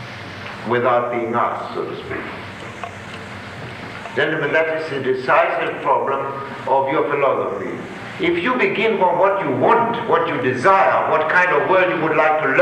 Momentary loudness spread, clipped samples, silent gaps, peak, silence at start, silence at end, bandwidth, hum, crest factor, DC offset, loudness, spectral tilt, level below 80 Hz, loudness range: 16 LU; under 0.1%; none; -2 dBFS; 0 s; 0 s; 11.5 kHz; none; 16 dB; under 0.1%; -18 LUFS; -6 dB/octave; -54 dBFS; 8 LU